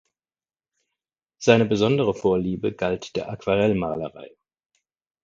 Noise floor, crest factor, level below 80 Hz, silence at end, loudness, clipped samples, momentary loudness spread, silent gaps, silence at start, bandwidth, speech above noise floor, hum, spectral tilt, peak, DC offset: under -90 dBFS; 24 dB; -52 dBFS; 0.95 s; -22 LUFS; under 0.1%; 11 LU; none; 1.4 s; 7.8 kHz; over 68 dB; none; -6 dB/octave; 0 dBFS; under 0.1%